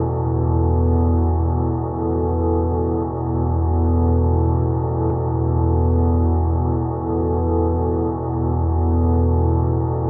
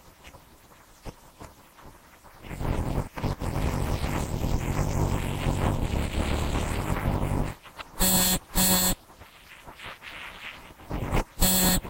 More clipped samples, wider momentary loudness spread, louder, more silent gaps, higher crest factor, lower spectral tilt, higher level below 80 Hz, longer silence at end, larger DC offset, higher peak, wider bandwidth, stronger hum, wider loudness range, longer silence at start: neither; second, 4 LU vs 25 LU; first, -19 LUFS vs -27 LUFS; neither; second, 10 dB vs 20 dB; first, -11 dB/octave vs -4 dB/octave; first, -24 dBFS vs -34 dBFS; about the same, 0 s vs 0 s; neither; about the same, -8 dBFS vs -8 dBFS; second, 1.9 kHz vs 16 kHz; neither; second, 1 LU vs 9 LU; about the same, 0 s vs 0.05 s